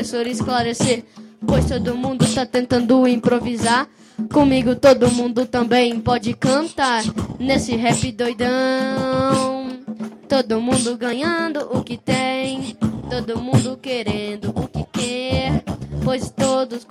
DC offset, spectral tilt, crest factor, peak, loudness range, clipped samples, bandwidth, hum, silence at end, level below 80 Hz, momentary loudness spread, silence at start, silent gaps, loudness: under 0.1%; -5 dB/octave; 18 dB; -2 dBFS; 6 LU; under 0.1%; 13.5 kHz; none; 0.1 s; -42 dBFS; 9 LU; 0 s; none; -19 LUFS